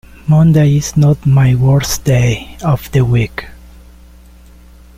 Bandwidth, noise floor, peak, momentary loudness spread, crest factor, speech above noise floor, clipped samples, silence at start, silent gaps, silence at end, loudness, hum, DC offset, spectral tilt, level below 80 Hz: 16 kHz; -39 dBFS; -2 dBFS; 8 LU; 10 dB; 28 dB; under 0.1%; 0.25 s; none; 1.45 s; -12 LUFS; none; under 0.1%; -6.5 dB/octave; -32 dBFS